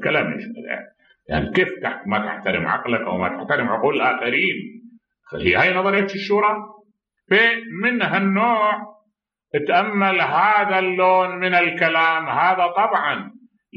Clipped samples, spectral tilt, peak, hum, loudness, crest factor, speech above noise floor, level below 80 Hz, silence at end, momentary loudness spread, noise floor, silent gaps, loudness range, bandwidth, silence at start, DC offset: under 0.1%; -7 dB/octave; -2 dBFS; none; -19 LUFS; 18 dB; 53 dB; -50 dBFS; 0 s; 11 LU; -72 dBFS; none; 4 LU; 7 kHz; 0 s; under 0.1%